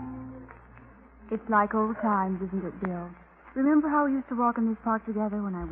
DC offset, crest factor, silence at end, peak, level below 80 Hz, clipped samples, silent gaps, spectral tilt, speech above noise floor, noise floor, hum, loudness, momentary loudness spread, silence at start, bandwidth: under 0.1%; 18 dB; 0 s; -10 dBFS; -54 dBFS; under 0.1%; none; -12 dB/octave; 25 dB; -52 dBFS; none; -28 LUFS; 15 LU; 0 s; 3.3 kHz